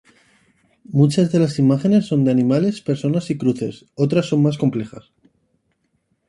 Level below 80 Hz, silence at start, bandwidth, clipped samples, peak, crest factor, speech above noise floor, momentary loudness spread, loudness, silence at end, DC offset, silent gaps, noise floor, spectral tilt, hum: -58 dBFS; 0.9 s; 11.5 kHz; under 0.1%; -2 dBFS; 16 dB; 50 dB; 8 LU; -18 LUFS; 1.3 s; under 0.1%; none; -68 dBFS; -8 dB/octave; none